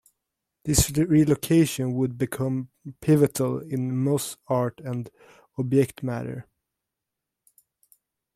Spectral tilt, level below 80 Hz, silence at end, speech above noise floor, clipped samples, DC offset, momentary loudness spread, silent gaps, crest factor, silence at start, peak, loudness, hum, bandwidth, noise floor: -6 dB/octave; -46 dBFS; 1.95 s; 61 dB; under 0.1%; under 0.1%; 14 LU; none; 22 dB; 0.65 s; -4 dBFS; -24 LUFS; none; 15.5 kHz; -85 dBFS